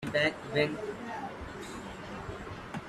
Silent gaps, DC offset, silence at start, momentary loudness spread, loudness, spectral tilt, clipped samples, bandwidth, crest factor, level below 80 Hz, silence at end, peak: none; under 0.1%; 0 s; 13 LU; -35 LUFS; -5 dB/octave; under 0.1%; 14 kHz; 20 dB; -56 dBFS; 0 s; -14 dBFS